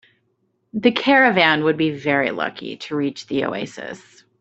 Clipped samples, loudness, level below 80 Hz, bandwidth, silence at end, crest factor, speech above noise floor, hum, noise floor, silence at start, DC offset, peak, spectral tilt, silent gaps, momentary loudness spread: under 0.1%; -19 LUFS; -64 dBFS; 8.2 kHz; 0.45 s; 18 dB; 48 dB; none; -68 dBFS; 0.75 s; under 0.1%; -2 dBFS; -5.5 dB/octave; none; 17 LU